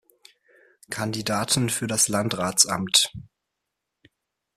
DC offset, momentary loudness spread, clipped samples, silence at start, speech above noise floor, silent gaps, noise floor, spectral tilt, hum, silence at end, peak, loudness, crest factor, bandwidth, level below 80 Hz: under 0.1%; 9 LU; under 0.1%; 0.9 s; 59 dB; none; -82 dBFS; -2.5 dB/octave; none; 1.35 s; -2 dBFS; -22 LUFS; 24 dB; 15.5 kHz; -60 dBFS